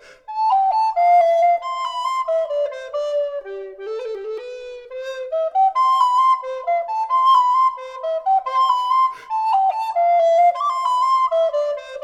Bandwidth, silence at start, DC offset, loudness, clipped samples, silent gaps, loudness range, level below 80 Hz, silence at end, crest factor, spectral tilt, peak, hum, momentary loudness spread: 10 kHz; 0.3 s; under 0.1%; -18 LUFS; under 0.1%; none; 7 LU; -64 dBFS; 0 s; 12 dB; -0.5 dB/octave; -6 dBFS; none; 15 LU